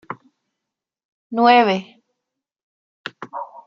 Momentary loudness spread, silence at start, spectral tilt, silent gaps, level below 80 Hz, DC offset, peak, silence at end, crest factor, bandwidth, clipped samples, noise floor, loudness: 23 LU; 0.1 s; -6 dB/octave; 1.05-1.30 s, 2.63-3.04 s; -76 dBFS; under 0.1%; -2 dBFS; 0.2 s; 22 dB; 7 kHz; under 0.1%; -84 dBFS; -16 LUFS